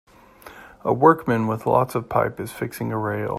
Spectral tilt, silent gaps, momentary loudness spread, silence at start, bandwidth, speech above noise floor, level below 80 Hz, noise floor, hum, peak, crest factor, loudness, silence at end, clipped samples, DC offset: -7.5 dB/octave; none; 13 LU; 0.45 s; 15.5 kHz; 25 dB; -54 dBFS; -46 dBFS; none; -2 dBFS; 20 dB; -22 LUFS; 0 s; under 0.1%; under 0.1%